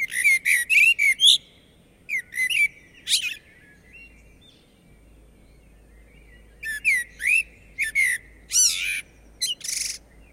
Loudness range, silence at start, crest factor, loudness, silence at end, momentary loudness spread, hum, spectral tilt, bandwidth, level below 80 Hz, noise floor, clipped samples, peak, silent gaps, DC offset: 12 LU; 0 s; 20 dB; -20 LUFS; 0.35 s; 15 LU; none; 3 dB/octave; 16 kHz; -54 dBFS; -55 dBFS; under 0.1%; -4 dBFS; none; under 0.1%